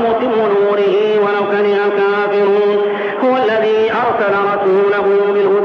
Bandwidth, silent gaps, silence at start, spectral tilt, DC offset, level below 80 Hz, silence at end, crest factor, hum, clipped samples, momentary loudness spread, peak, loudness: 6 kHz; none; 0 s; -7 dB/octave; under 0.1%; -60 dBFS; 0 s; 8 dB; none; under 0.1%; 2 LU; -6 dBFS; -13 LUFS